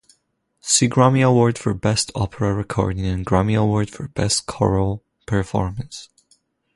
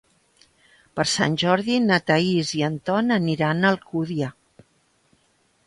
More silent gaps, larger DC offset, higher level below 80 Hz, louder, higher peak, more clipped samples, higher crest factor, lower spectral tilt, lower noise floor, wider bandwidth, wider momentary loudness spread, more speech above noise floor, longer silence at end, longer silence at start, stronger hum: neither; neither; first, -38 dBFS vs -62 dBFS; about the same, -20 LUFS vs -22 LUFS; first, -2 dBFS vs -6 dBFS; neither; about the same, 18 dB vs 18 dB; about the same, -5 dB/octave vs -5 dB/octave; first, -68 dBFS vs -64 dBFS; about the same, 11.5 kHz vs 11.5 kHz; first, 12 LU vs 8 LU; first, 49 dB vs 43 dB; second, 0.7 s vs 1.35 s; second, 0.65 s vs 0.95 s; neither